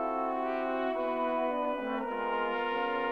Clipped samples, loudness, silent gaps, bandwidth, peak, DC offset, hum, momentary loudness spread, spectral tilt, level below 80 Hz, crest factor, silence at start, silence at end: under 0.1%; -32 LUFS; none; 6.4 kHz; -18 dBFS; under 0.1%; none; 2 LU; -6 dB/octave; -66 dBFS; 14 dB; 0 s; 0 s